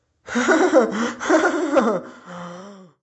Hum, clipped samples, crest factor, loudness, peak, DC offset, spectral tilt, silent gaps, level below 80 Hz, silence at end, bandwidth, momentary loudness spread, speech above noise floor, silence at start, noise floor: none; under 0.1%; 16 dB; -19 LUFS; -4 dBFS; under 0.1%; -4 dB/octave; none; -64 dBFS; 0.2 s; 8.4 kHz; 20 LU; 21 dB; 0.25 s; -40 dBFS